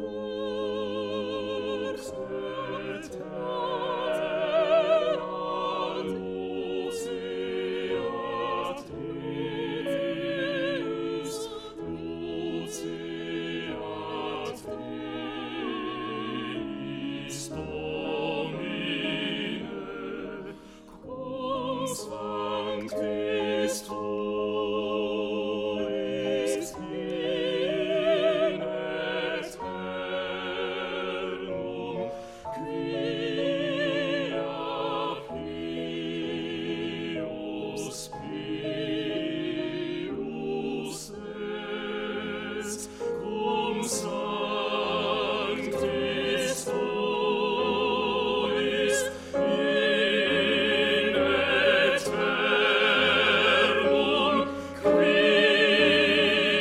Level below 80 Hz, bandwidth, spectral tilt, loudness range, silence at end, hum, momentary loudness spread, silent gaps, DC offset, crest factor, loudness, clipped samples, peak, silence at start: -58 dBFS; 15.5 kHz; -4 dB/octave; 11 LU; 0 s; none; 13 LU; none; under 0.1%; 20 dB; -28 LUFS; under 0.1%; -8 dBFS; 0 s